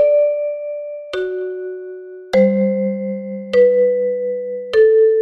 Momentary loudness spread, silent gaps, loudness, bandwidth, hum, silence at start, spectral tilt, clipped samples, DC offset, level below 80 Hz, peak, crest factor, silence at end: 15 LU; none; -17 LUFS; 6.4 kHz; none; 0 s; -8 dB/octave; under 0.1%; under 0.1%; -58 dBFS; -2 dBFS; 14 dB; 0 s